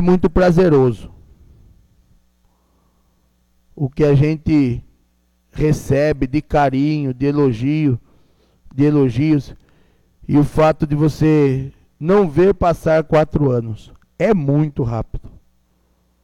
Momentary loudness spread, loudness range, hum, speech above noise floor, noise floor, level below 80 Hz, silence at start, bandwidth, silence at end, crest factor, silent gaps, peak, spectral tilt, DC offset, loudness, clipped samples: 12 LU; 5 LU; none; 45 dB; -60 dBFS; -34 dBFS; 0 s; 12.5 kHz; 0.95 s; 14 dB; none; -4 dBFS; -8.5 dB/octave; under 0.1%; -16 LUFS; under 0.1%